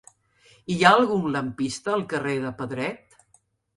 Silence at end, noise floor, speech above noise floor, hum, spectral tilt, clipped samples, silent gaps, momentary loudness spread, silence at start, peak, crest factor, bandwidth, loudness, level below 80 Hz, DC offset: 0.8 s; -64 dBFS; 40 dB; none; -5 dB/octave; under 0.1%; none; 14 LU; 0.7 s; -2 dBFS; 24 dB; 11.5 kHz; -23 LUFS; -62 dBFS; under 0.1%